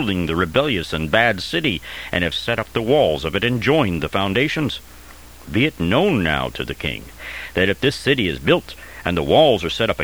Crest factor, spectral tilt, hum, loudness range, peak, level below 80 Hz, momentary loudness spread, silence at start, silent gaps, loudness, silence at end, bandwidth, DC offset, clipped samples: 18 dB; -5.5 dB/octave; none; 2 LU; 0 dBFS; -40 dBFS; 9 LU; 0 s; none; -19 LUFS; 0 s; over 20 kHz; 0.4%; under 0.1%